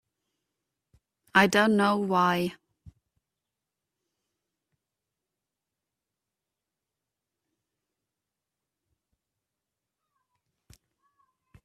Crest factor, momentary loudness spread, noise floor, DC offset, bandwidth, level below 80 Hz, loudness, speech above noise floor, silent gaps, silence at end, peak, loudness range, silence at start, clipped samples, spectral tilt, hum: 28 dB; 7 LU; -88 dBFS; under 0.1%; 15 kHz; -70 dBFS; -24 LUFS; 65 dB; none; 8.75 s; -4 dBFS; 7 LU; 1.35 s; under 0.1%; -5 dB/octave; none